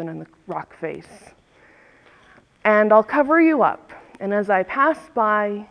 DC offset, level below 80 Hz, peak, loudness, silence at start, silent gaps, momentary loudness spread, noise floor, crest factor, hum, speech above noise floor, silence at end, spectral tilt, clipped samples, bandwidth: under 0.1%; -64 dBFS; -2 dBFS; -18 LUFS; 0 s; none; 17 LU; -53 dBFS; 20 dB; none; 34 dB; 0.05 s; -7.5 dB/octave; under 0.1%; 10 kHz